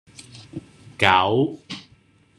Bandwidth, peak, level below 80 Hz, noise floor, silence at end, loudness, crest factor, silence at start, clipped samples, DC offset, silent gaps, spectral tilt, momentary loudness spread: 12.5 kHz; -2 dBFS; -60 dBFS; -56 dBFS; 0.6 s; -19 LUFS; 22 dB; 0.2 s; under 0.1%; under 0.1%; none; -5 dB/octave; 24 LU